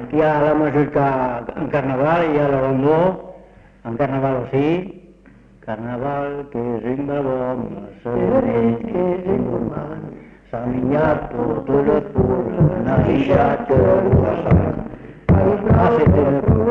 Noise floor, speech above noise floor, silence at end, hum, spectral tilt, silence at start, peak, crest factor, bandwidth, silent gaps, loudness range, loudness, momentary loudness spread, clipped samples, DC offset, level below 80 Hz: -47 dBFS; 29 dB; 0 s; none; -10.5 dB/octave; 0 s; -2 dBFS; 16 dB; 6.2 kHz; none; 7 LU; -18 LUFS; 13 LU; under 0.1%; under 0.1%; -36 dBFS